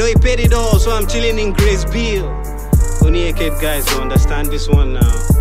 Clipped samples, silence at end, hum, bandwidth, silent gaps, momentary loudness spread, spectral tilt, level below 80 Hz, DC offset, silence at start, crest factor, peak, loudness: under 0.1%; 0 s; none; 16.5 kHz; none; 5 LU; -5.5 dB/octave; -16 dBFS; 1%; 0 s; 12 dB; 0 dBFS; -15 LUFS